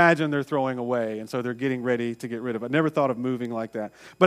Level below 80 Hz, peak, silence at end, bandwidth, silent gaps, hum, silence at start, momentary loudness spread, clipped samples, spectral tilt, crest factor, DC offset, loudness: -72 dBFS; -2 dBFS; 0 s; 15 kHz; none; none; 0 s; 7 LU; under 0.1%; -7 dB/octave; 22 dB; under 0.1%; -26 LUFS